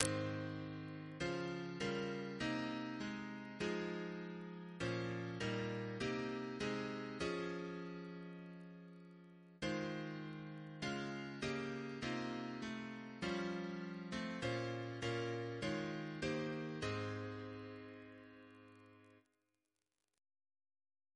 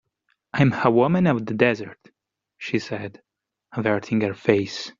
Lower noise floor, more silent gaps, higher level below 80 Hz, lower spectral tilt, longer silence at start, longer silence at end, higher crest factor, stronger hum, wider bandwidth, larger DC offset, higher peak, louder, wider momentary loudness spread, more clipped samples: first, -90 dBFS vs -71 dBFS; neither; second, -70 dBFS vs -58 dBFS; about the same, -5 dB/octave vs -5.5 dB/octave; second, 0 s vs 0.55 s; first, 2 s vs 0.1 s; first, 36 dB vs 20 dB; neither; first, 11 kHz vs 7.6 kHz; neither; second, -10 dBFS vs -2 dBFS; second, -44 LUFS vs -22 LUFS; about the same, 13 LU vs 15 LU; neither